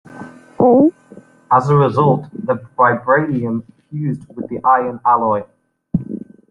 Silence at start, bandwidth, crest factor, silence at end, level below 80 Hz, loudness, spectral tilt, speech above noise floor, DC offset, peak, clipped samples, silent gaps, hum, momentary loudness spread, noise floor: 0.1 s; 7.6 kHz; 14 dB; 0.35 s; -52 dBFS; -16 LUFS; -9.5 dB/octave; 28 dB; under 0.1%; -2 dBFS; under 0.1%; none; none; 16 LU; -43 dBFS